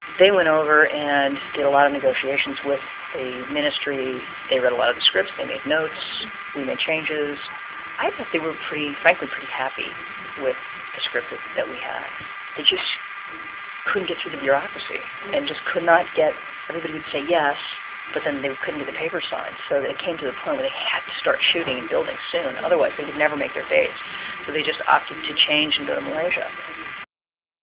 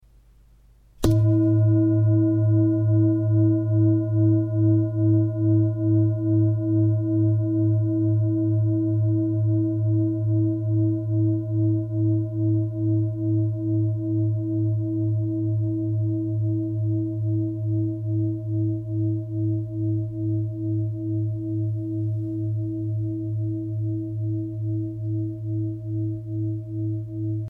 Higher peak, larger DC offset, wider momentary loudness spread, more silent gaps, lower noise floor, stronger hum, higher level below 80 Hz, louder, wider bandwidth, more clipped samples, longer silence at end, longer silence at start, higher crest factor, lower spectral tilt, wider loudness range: first, -2 dBFS vs -6 dBFS; neither; first, 13 LU vs 8 LU; neither; first, under -90 dBFS vs -54 dBFS; neither; second, -62 dBFS vs -50 dBFS; about the same, -22 LUFS vs -23 LUFS; about the same, 4 kHz vs 3.9 kHz; neither; first, 0.6 s vs 0 s; second, 0 s vs 1 s; first, 22 dB vs 16 dB; second, -7 dB/octave vs -11 dB/octave; second, 4 LU vs 7 LU